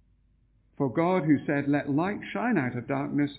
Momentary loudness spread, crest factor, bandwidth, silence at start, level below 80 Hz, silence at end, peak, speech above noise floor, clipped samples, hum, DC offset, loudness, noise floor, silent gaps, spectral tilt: 6 LU; 16 dB; 4 kHz; 0.8 s; -62 dBFS; 0 s; -12 dBFS; 38 dB; under 0.1%; none; under 0.1%; -27 LUFS; -65 dBFS; none; -7 dB/octave